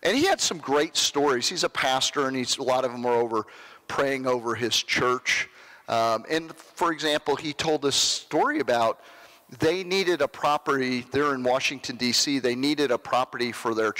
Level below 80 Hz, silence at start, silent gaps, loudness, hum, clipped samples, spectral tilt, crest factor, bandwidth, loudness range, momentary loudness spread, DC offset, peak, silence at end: -64 dBFS; 0 s; none; -25 LUFS; none; under 0.1%; -2.5 dB/octave; 12 dB; 16 kHz; 1 LU; 6 LU; under 0.1%; -14 dBFS; 0 s